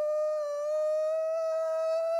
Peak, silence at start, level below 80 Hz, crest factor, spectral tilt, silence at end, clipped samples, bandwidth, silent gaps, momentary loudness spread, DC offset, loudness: -24 dBFS; 0 s; under -90 dBFS; 6 dB; 0 dB/octave; 0 s; under 0.1%; 11.5 kHz; none; 2 LU; under 0.1%; -30 LUFS